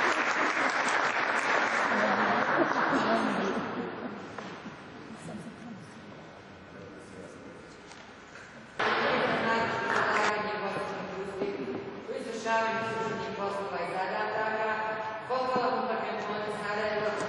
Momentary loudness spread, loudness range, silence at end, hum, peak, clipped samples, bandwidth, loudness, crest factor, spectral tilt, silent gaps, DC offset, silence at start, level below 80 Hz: 20 LU; 17 LU; 0 s; none; -14 dBFS; under 0.1%; 11.5 kHz; -29 LUFS; 18 dB; -4 dB/octave; none; under 0.1%; 0 s; -68 dBFS